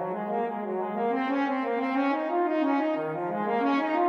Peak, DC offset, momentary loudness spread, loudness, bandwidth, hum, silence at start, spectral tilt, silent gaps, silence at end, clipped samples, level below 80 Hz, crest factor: -14 dBFS; under 0.1%; 5 LU; -28 LUFS; 6.4 kHz; none; 0 s; -7.5 dB/octave; none; 0 s; under 0.1%; -82 dBFS; 12 dB